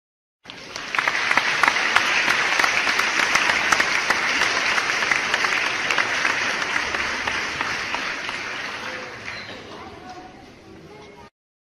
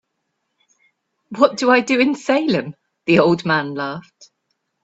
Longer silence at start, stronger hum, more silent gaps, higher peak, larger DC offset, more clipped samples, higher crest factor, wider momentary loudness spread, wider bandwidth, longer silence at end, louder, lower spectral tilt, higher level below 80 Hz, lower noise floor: second, 0.45 s vs 1.3 s; neither; neither; about the same, 0 dBFS vs 0 dBFS; neither; neither; about the same, 24 dB vs 20 dB; first, 17 LU vs 14 LU; first, 15 kHz vs 8 kHz; second, 0.45 s vs 0.85 s; second, -20 LUFS vs -17 LUFS; second, -0.5 dB/octave vs -5.5 dB/octave; first, -56 dBFS vs -62 dBFS; second, -44 dBFS vs -74 dBFS